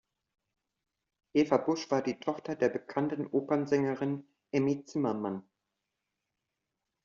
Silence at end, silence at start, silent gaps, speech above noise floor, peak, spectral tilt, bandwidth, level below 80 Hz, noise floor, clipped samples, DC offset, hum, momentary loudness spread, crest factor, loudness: 1.65 s; 1.35 s; none; 56 dB; -10 dBFS; -6 dB/octave; 7.2 kHz; -74 dBFS; -86 dBFS; under 0.1%; under 0.1%; none; 8 LU; 22 dB; -32 LUFS